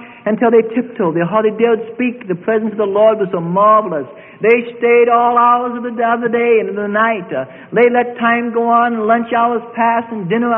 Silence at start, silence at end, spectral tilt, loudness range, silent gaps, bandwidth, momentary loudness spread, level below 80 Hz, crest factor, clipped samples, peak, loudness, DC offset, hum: 0 s; 0 s; -10 dB/octave; 2 LU; none; 3.7 kHz; 9 LU; -62 dBFS; 14 dB; under 0.1%; 0 dBFS; -14 LUFS; under 0.1%; none